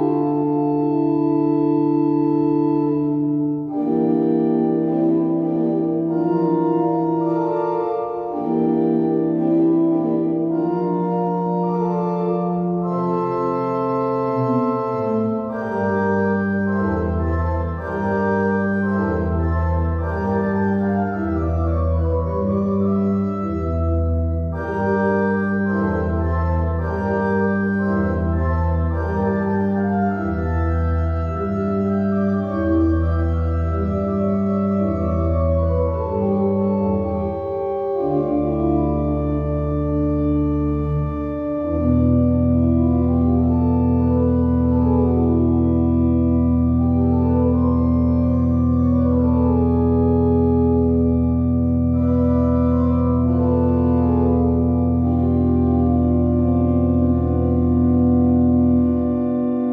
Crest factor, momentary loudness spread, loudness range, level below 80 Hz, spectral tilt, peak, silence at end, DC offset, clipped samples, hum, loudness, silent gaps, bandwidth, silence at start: 12 dB; 5 LU; 3 LU; -30 dBFS; -11.5 dB/octave; -6 dBFS; 0 s; under 0.1%; under 0.1%; none; -19 LUFS; none; 4.7 kHz; 0 s